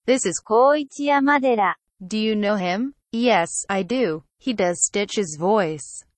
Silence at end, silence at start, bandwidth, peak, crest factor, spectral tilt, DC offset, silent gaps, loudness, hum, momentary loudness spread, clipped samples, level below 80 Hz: 0.15 s; 0.05 s; 9.8 kHz; -6 dBFS; 16 dB; -3.5 dB/octave; under 0.1%; none; -21 LUFS; none; 9 LU; under 0.1%; -62 dBFS